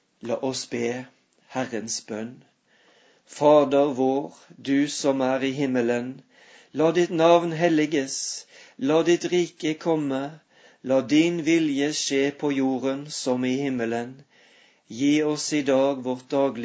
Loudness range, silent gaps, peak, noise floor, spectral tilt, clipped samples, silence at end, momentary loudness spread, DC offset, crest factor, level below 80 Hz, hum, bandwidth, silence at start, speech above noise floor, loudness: 3 LU; none; -4 dBFS; -60 dBFS; -4.5 dB/octave; under 0.1%; 0 s; 14 LU; under 0.1%; 20 dB; -74 dBFS; none; 8 kHz; 0.25 s; 37 dB; -24 LUFS